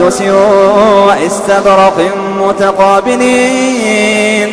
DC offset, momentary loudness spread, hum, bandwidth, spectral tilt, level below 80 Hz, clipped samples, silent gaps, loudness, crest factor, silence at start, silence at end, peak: under 0.1%; 5 LU; none; 11 kHz; -4 dB/octave; -42 dBFS; 0.5%; none; -8 LUFS; 8 dB; 0 s; 0 s; 0 dBFS